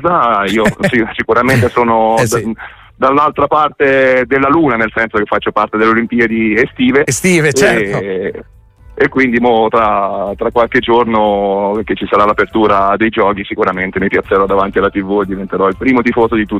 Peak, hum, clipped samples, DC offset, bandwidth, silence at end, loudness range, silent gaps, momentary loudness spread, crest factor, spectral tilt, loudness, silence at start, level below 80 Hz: 0 dBFS; none; under 0.1%; under 0.1%; 15.5 kHz; 0 s; 2 LU; none; 5 LU; 12 dB; -5 dB/octave; -12 LUFS; 0 s; -38 dBFS